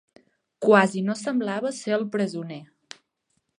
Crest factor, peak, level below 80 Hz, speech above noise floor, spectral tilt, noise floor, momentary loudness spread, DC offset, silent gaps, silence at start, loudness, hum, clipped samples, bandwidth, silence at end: 24 dB; -2 dBFS; -78 dBFS; 51 dB; -5.5 dB/octave; -74 dBFS; 19 LU; under 0.1%; none; 0.6 s; -24 LUFS; none; under 0.1%; 11 kHz; 0.95 s